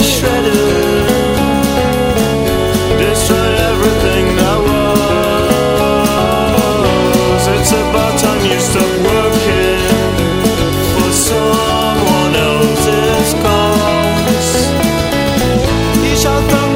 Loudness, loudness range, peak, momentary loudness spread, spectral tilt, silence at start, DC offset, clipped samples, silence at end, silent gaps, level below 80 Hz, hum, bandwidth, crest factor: -12 LUFS; 1 LU; 0 dBFS; 2 LU; -4.5 dB/octave; 0 s; under 0.1%; under 0.1%; 0 s; none; -24 dBFS; none; 16.5 kHz; 12 dB